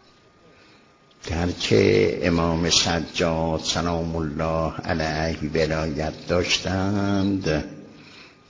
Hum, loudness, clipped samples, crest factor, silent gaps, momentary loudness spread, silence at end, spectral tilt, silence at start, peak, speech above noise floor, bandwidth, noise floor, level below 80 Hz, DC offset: none; -23 LUFS; under 0.1%; 20 dB; none; 9 LU; 0.2 s; -4.5 dB/octave; 1.25 s; -4 dBFS; 32 dB; 7.6 kHz; -54 dBFS; -38 dBFS; under 0.1%